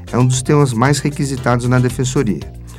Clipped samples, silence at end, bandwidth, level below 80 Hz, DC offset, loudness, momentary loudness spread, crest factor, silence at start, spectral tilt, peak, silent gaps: under 0.1%; 0 s; 14 kHz; -36 dBFS; under 0.1%; -15 LUFS; 6 LU; 16 dB; 0 s; -6 dB/octave; 0 dBFS; none